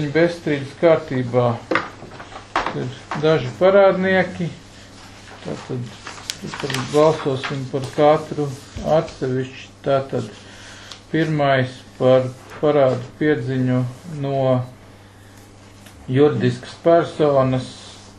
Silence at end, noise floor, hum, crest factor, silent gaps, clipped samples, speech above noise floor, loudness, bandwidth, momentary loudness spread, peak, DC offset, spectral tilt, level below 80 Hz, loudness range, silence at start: 0.05 s; -44 dBFS; none; 20 dB; none; under 0.1%; 25 dB; -20 LUFS; 12.5 kHz; 18 LU; 0 dBFS; under 0.1%; -6.5 dB/octave; -50 dBFS; 4 LU; 0 s